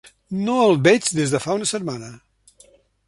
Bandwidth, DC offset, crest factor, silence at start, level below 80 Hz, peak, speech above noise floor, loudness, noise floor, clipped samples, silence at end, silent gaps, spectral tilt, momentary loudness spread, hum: 11.5 kHz; under 0.1%; 20 dB; 0.3 s; -58 dBFS; -2 dBFS; 35 dB; -19 LUFS; -54 dBFS; under 0.1%; 0.9 s; none; -4.5 dB/octave; 15 LU; none